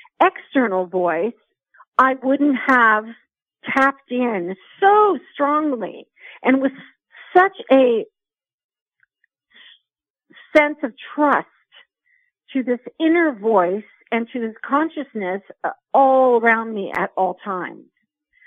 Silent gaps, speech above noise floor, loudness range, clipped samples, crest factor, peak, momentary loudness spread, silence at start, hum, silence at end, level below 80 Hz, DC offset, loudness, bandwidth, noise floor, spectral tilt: 1.87-1.92 s, 8.54-8.69 s, 8.82-8.86 s, 10.10-10.14 s; 62 dB; 5 LU; under 0.1%; 18 dB; -2 dBFS; 13 LU; 0.2 s; none; 0.75 s; -68 dBFS; under 0.1%; -19 LUFS; 9.2 kHz; -81 dBFS; -6.5 dB/octave